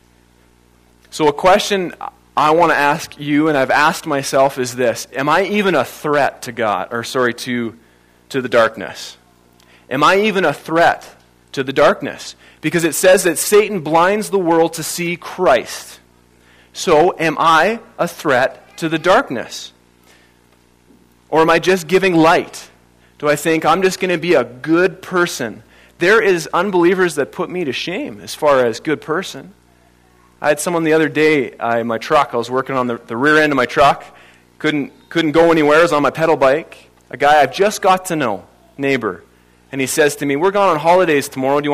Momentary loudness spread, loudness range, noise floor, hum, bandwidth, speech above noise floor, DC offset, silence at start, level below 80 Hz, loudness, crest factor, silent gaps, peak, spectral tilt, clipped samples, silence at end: 12 LU; 4 LU; -52 dBFS; 60 Hz at -50 dBFS; 15.5 kHz; 37 dB; under 0.1%; 1.15 s; -52 dBFS; -15 LUFS; 14 dB; none; -2 dBFS; -4 dB/octave; under 0.1%; 0 s